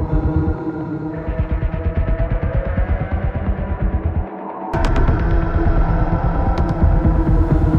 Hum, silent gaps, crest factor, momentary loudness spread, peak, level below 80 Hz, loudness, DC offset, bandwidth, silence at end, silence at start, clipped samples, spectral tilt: none; none; 14 dB; 8 LU; -2 dBFS; -20 dBFS; -20 LUFS; under 0.1%; 5.8 kHz; 0 s; 0 s; under 0.1%; -9.5 dB/octave